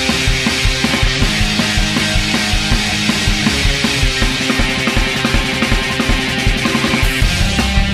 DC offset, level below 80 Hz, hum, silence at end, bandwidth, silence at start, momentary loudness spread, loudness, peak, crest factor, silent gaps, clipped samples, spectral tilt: under 0.1%; -20 dBFS; none; 0 s; 15 kHz; 0 s; 1 LU; -14 LUFS; 0 dBFS; 14 dB; none; under 0.1%; -3.5 dB/octave